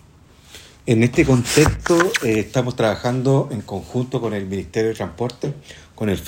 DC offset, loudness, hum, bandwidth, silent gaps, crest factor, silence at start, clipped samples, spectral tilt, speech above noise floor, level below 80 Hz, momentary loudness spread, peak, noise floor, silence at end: under 0.1%; -20 LUFS; none; 16.5 kHz; none; 20 dB; 0.5 s; under 0.1%; -5.5 dB/octave; 29 dB; -40 dBFS; 11 LU; 0 dBFS; -48 dBFS; 0 s